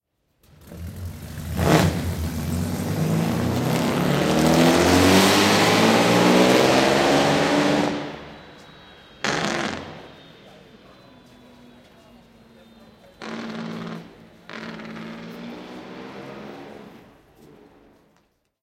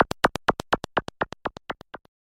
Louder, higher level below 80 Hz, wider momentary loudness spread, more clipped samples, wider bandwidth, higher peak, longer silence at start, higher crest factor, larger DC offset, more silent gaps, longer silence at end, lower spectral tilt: first, -19 LUFS vs -27 LUFS; about the same, -44 dBFS vs -48 dBFS; first, 22 LU vs 15 LU; neither; about the same, 16.5 kHz vs 16 kHz; first, 0 dBFS vs -6 dBFS; first, 0.65 s vs 0 s; about the same, 22 dB vs 22 dB; neither; neither; first, 1.65 s vs 0.3 s; about the same, -4.5 dB/octave vs -4.5 dB/octave